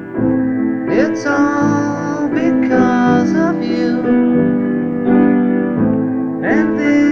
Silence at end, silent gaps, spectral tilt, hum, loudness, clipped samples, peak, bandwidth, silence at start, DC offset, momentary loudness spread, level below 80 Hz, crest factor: 0 s; none; -7.5 dB/octave; none; -14 LUFS; under 0.1%; 0 dBFS; 6.8 kHz; 0 s; under 0.1%; 5 LU; -46 dBFS; 12 dB